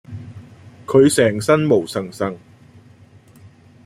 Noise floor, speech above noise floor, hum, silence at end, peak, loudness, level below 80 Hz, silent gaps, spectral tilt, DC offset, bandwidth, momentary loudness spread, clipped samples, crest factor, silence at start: -47 dBFS; 31 dB; none; 1.5 s; -2 dBFS; -17 LUFS; -56 dBFS; none; -5.5 dB/octave; under 0.1%; 15 kHz; 24 LU; under 0.1%; 18 dB; 0.1 s